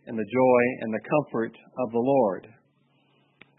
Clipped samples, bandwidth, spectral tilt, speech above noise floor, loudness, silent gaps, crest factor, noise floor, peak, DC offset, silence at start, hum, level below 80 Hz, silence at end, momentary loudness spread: under 0.1%; 4 kHz; -11.5 dB/octave; 41 dB; -25 LUFS; none; 18 dB; -66 dBFS; -10 dBFS; under 0.1%; 0.05 s; none; -72 dBFS; 1.1 s; 12 LU